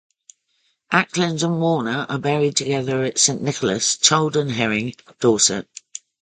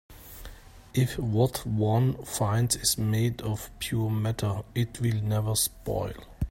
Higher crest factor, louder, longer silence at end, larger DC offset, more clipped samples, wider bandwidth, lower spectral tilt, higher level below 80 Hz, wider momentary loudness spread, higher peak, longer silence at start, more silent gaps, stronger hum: about the same, 20 dB vs 18 dB; first, -19 LUFS vs -28 LUFS; first, 0.25 s vs 0 s; neither; neither; second, 9.6 kHz vs 16.5 kHz; second, -3 dB/octave vs -5 dB/octave; second, -60 dBFS vs -46 dBFS; second, 9 LU vs 12 LU; first, 0 dBFS vs -10 dBFS; first, 0.9 s vs 0.1 s; neither; neither